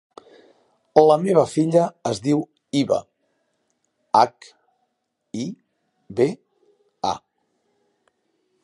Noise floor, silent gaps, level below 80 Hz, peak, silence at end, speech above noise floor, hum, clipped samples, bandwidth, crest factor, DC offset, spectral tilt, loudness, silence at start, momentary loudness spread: -75 dBFS; none; -64 dBFS; 0 dBFS; 1.45 s; 56 dB; none; under 0.1%; 11.5 kHz; 22 dB; under 0.1%; -6.5 dB/octave; -21 LUFS; 0.95 s; 16 LU